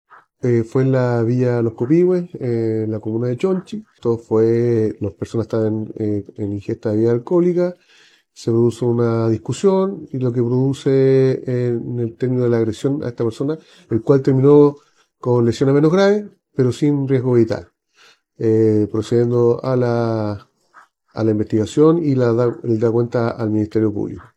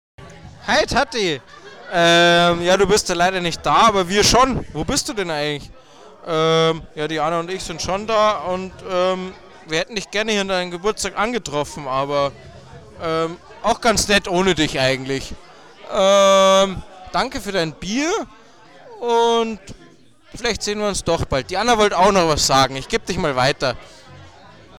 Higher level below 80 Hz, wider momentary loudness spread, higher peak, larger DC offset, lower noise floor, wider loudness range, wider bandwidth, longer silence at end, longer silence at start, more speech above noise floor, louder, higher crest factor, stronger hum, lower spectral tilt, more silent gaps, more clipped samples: second, -60 dBFS vs -40 dBFS; about the same, 10 LU vs 12 LU; about the same, -2 dBFS vs -4 dBFS; second, under 0.1% vs 0.3%; first, -53 dBFS vs -49 dBFS; about the same, 4 LU vs 6 LU; second, 9.8 kHz vs 18 kHz; second, 0.15 s vs 0.5 s; first, 0.45 s vs 0.2 s; first, 36 dB vs 31 dB; about the same, -18 LUFS vs -18 LUFS; about the same, 16 dB vs 16 dB; neither; first, -8.5 dB/octave vs -3.5 dB/octave; neither; neither